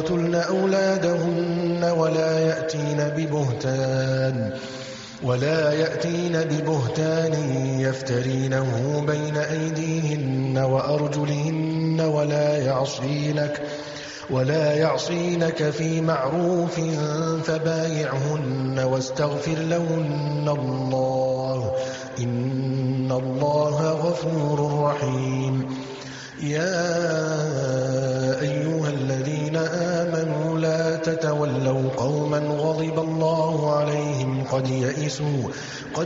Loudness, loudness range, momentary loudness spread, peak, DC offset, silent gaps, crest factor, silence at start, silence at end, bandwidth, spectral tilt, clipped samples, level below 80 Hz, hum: -24 LUFS; 2 LU; 4 LU; -6 dBFS; under 0.1%; none; 16 dB; 0 s; 0 s; 7.8 kHz; -6 dB/octave; under 0.1%; -56 dBFS; none